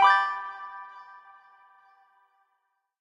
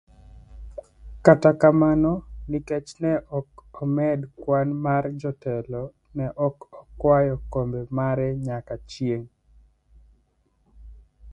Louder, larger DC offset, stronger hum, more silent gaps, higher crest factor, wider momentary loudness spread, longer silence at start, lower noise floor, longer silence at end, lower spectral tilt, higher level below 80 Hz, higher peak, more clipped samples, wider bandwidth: second, -27 LUFS vs -24 LUFS; neither; neither; neither; about the same, 22 dB vs 24 dB; first, 27 LU vs 16 LU; second, 0 s vs 0.35 s; first, -77 dBFS vs -66 dBFS; first, 2 s vs 0 s; second, 0.5 dB/octave vs -8.5 dB/octave; second, -82 dBFS vs -46 dBFS; second, -8 dBFS vs 0 dBFS; neither; about the same, 11 kHz vs 10 kHz